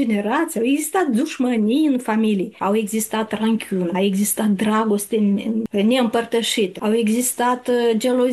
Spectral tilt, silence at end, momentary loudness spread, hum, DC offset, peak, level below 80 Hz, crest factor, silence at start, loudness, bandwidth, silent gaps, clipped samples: -4.5 dB/octave; 0 s; 3 LU; none; under 0.1%; -6 dBFS; -64 dBFS; 12 dB; 0 s; -19 LUFS; 13 kHz; none; under 0.1%